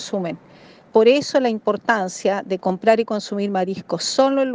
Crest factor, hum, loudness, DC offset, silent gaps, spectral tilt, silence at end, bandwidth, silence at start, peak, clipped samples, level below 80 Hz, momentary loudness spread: 18 dB; none; -20 LUFS; under 0.1%; none; -4.5 dB/octave; 0 s; 9.8 kHz; 0 s; -2 dBFS; under 0.1%; -68 dBFS; 9 LU